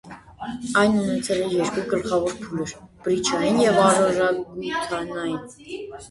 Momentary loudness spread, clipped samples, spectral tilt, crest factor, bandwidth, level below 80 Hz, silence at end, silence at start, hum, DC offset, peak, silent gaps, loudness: 16 LU; under 0.1%; -4.5 dB/octave; 20 dB; 11.5 kHz; -54 dBFS; 0 s; 0.05 s; none; under 0.1%; -4 dBFS; none; -22 LUFS